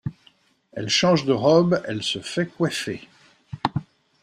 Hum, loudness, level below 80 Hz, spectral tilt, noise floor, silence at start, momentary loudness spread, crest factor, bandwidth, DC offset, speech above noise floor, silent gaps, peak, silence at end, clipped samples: none; -22 LUFS; -60 dBFS; -5 dB/octave; -59 dBFS; 0.05 s; 17 LU; 20 dB; 13.5 kHz; under 0.1%; 38 dB; none; -4 dBFS; 0.4 s; under 0.1%